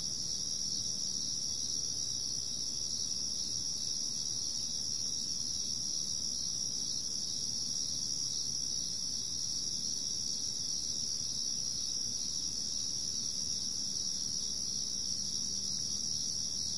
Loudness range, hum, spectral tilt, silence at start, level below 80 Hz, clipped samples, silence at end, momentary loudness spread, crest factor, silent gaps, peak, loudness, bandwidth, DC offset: 0 LU; none; 0 dB/octave; 0 s; -62 dBFS; under 0.1%; 0 s; 1 LU; 14 dB; none; -22 dBFS; -33 LUFS; 11.5 kHz; 0.5%